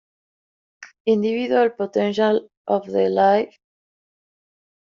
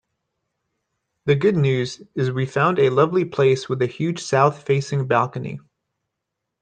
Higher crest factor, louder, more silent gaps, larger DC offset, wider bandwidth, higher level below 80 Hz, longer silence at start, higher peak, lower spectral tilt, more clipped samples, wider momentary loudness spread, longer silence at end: about the same, 16 dB vs 18 dB; about the same, -20 LUFS vs -20 LUFS; first, 1.00-1.05 s, 2.57-2.65 s vs none; neither; second, 7.2 kHz vs 9.2 kHz; second, -68 dBFS vs -62 dBFS; second, 0.8 s vs 1.25 s; second, -6 dBFS vs -2 dBFS; second, -4.5 dB/octave vs -6.5 dB/octave; neither; about the same, 7 LU vs 9 LU; first, 1.4 s vs 1.05 s